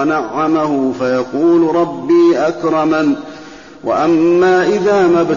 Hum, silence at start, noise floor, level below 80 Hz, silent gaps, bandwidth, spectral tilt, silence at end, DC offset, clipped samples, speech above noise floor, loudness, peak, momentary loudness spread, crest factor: none; 0 s; -34 dBFS; -52 dBFS; none; 7.4 kHz; -5.5 dB/octave; 0 s; 0.3%; under 0.1%; 22 dB; -13 LUFS; -4 dBFS; 7 LU; 10 dB